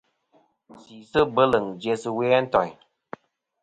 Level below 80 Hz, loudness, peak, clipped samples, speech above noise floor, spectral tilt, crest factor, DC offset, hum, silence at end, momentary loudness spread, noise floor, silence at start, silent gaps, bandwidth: -56 dBFS; -23 LUFS; -4 dBFS; under 0.1%; 41 dB; -6 dB/octave; 22 dB; under 0.1%; none; 0.9 s; 23 LU; -64 dBFS; 0.9 s; none; 9.2 kHz